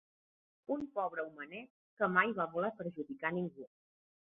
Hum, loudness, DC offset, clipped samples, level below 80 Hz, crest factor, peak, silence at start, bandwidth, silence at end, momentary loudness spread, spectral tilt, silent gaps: none; -37 LUFS; under 0.1%; under 0.1%; -80 dBFS; 24 dB; -14 dBFS; 0.7 s; 4 kHz; 0.7 s; 18 LU; -4.5 dB/octave; 1.70-1.97 s